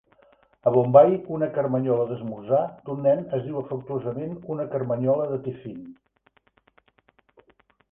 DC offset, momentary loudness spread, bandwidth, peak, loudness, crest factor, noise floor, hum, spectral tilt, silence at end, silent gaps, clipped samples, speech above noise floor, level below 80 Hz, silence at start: under 0.1%; 16 LU; 3.6 kHz; -2 dBFS; -24 LUFS; 24 dB; -65 dBFS; none; -11.5 dB/octave; 2 s; none; under 0.1%; 41 dB; -64 dBFS; 0.65 s